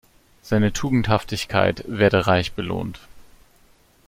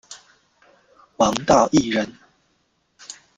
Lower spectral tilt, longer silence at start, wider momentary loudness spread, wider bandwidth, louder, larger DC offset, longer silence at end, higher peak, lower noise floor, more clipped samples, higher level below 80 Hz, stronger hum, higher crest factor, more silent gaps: first, -6 dB/octave vs -4.5 dB/octave; first, 0.45 s vs 0.1 s; second, 9 LU vs 26 LU; first, 16 kHz vs 13 kHz; about the same, -21 LUFS vs -19 LUFS; neither; first, 0.85 s vs 0.25 s; about the same, -2 dBFS vs -2 dBFS; second, -56 dBFS vs -67 dBFS; neither; first, -44 dBFS vs -52 dBFS; neither; about the same, 20 dB vs 22 dB; neither